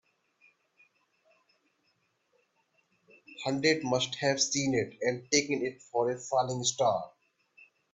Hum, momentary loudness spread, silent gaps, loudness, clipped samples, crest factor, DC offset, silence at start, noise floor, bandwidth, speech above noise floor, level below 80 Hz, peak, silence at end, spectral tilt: none; 7 LU; none; -30 LUFS; under 0.1%; 22 dB; under 0.1%; 3.3 s; -75 dBFS; 8.4 kHz; 45 dB; -72 dBFS; -10 dBFS; 0.3 s; -3 dB/octave